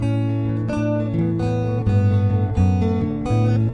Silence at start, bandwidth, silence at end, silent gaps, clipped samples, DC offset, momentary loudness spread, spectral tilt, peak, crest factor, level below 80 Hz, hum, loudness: 0 s; 6.4 kHz; 0 s; none; under 0.1%; under 0.1%; 4 LU; -9.5 dB/octave; -8 dBFS; 12 dB; -38 dBFS; none; -20 LUFS